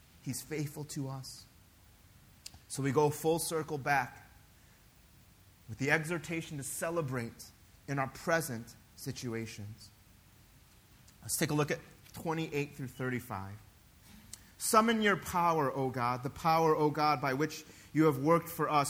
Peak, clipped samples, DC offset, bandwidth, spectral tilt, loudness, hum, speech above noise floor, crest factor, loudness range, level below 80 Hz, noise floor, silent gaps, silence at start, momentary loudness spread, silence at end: -12 dBFS; under 0.1%; under 0.1%; over 20 kHz; -5 dB/octave; -33 LUFS; none; 28 dB; 22 dB; 8 LU; -64 dBFS; -61 dBFS; none; 0.25 s; 22 LU; 0 s